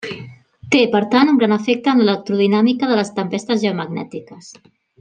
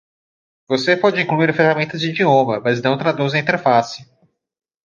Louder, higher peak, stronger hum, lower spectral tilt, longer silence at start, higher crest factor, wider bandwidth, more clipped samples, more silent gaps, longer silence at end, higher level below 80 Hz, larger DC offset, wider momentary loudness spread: about the same, -16 LUFS vs -17 LUFS; about the same, -2 dBFS vs -2 dBFS; neither; about the same, -5.5 dB/octave vs -6 dB/octave; second, 0 s vs 0.7 s; about the same, 16 dB vs 16 dB; first, 9.6 kHz vs 7.6 kHz; neither; neither; second, 0.5 s vs 0.8 s; about the same, -64 dBFS vs -64 dBFS; neither; first, 14 LU vs 6 LU